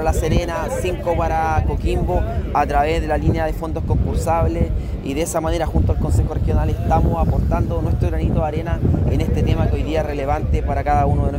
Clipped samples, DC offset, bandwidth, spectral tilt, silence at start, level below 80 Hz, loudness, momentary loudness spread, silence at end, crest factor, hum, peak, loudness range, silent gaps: under 0.1%; under 0.1%; 16 kHz; -7 dB/octave; 0 s; -22 dBFS; -20 LUFS; 4 LU; 0 s; 14 dB; none; -4 dBFS; 1 LU; none